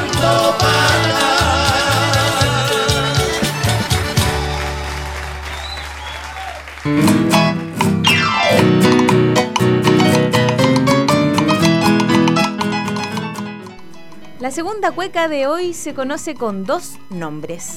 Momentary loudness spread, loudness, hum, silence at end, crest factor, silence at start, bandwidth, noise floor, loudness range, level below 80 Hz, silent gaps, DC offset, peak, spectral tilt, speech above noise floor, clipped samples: 14 LU; -15 LUFS; none; 0 s; 16 dB; 0 s; 17.5 kHz; -39 dBFS; 8 LU; -34 dBFS; none; under 0.1%; 0 dBFS; -4.5 dB/octave; 21 dB; under 0.1%